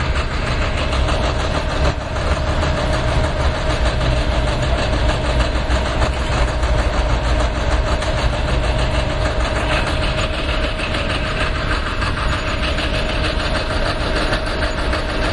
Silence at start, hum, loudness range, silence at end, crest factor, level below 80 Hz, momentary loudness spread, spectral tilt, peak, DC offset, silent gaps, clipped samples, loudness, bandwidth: 0 s; none; 1 LU; 0 s; 16 dB; -20 dBFS; 2 LU; -5 dB/octave; -2 dBFS; under 0.1%; none; under 0.1%; -19 LUFS; 11.5 kHz